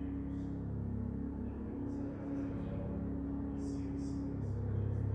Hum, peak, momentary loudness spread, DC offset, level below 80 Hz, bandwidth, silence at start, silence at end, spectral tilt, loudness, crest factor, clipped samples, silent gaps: none; -26 dBFS; 3 LU; under 0.1%; -48 dBFS; 8.8 kHz; 0 s; 0 s; -9.5 dB/octave; -40 LUFS; 14 dB; under 0.1%; none